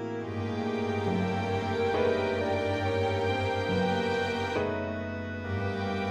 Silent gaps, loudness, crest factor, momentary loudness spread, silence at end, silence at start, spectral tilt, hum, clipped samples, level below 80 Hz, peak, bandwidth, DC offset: none; -30 LUFS; 14 dB; 7 LU; 0 s; 0 s; -6.5 dB/octave; none; under 0.1%; -58 dBFS; -14 dBFS; 10 kHz; under 0.1%